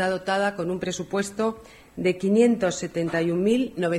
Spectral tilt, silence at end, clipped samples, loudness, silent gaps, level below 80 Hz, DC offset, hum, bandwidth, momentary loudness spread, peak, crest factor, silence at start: -5.5 dB/octave; 0 s; under 0.1%; -24 LUFS; none; -56 dBFS; under 0.1%; none; 14 kHz; 9 LU; -8 dBFS; 16 dB; 0 s